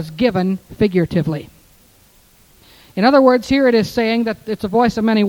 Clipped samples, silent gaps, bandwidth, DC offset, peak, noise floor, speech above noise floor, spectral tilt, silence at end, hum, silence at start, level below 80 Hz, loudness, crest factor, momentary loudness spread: under 0.1%; none; 18 kHz; under 0.1%; 0 dBFS; -51 dBFS; 35 dB; -7 dB/octave; 0 s; none; 0 s; -46 dBFS; -16 LUFS; 16 dB; 11 LU